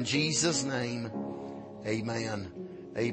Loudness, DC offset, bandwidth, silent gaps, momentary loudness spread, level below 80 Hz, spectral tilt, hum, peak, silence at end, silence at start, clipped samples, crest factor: -32 LUFS; under 0.1%; 8.8 kHz; none; 15 LU; -66 dBFS; -3.5 dB/octave; none; -16 dBFS; 0 s; 0 s; under 0.1%; 16 dB